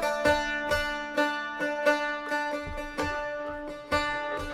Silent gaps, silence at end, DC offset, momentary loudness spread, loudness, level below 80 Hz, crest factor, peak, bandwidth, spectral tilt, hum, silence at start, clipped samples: none; 0 s; under 0.1%; 9 LU; -29 LUFS; -48 dBFS; 20 dB; -10 dBFS; 16 kHz; -4 dB/octave; none; 0 s; under 0.1%